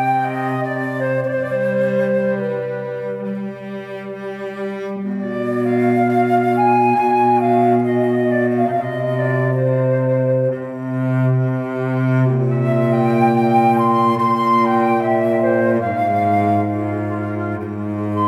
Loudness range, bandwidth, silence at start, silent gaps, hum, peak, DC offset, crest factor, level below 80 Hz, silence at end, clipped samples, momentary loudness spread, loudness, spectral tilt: 6 LU; 12 kHz; 0 s; none; none; -4 dBFS; under 0.1%; 14 dB; -68 dBFS; 0 s; under 0.1%; 10 LU; -18 LUFS; -9 dB/octave